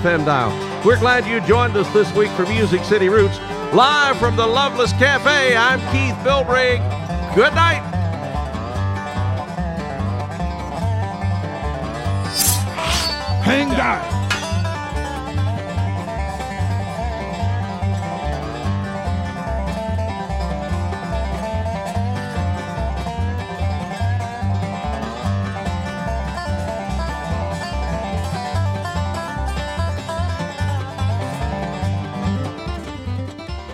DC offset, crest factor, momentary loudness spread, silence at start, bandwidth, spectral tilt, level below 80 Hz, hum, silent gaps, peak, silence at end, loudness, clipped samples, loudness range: under 0.1%; 18 dB; 10 LU; 0 s; 16.5 kHz; -5 dB/octave; -32 dBFS; none; none; -2 dBFS; 0 s; -20 LUFS; under 0.1%; 8 LU